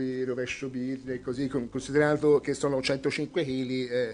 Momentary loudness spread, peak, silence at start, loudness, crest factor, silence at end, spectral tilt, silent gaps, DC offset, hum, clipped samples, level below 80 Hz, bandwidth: 9 LU; -10 dBFS; 0 s; -29 LUFS; 18 dB; 0 s; -5.5 dB/octave; none; under 0.1%; none; under 0.1%; -58 dBFS; 10.5 kHz